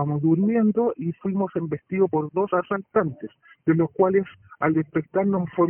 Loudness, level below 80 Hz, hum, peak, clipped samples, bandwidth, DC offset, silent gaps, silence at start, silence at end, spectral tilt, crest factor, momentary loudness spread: -23 LUFS; -62 dBFS; none; -6 dBFS; under 0.1%; 3.3 kHz; under 0.1%; none; 0 s; 0 s; -12 dB/octave; 16 dB; 8 LU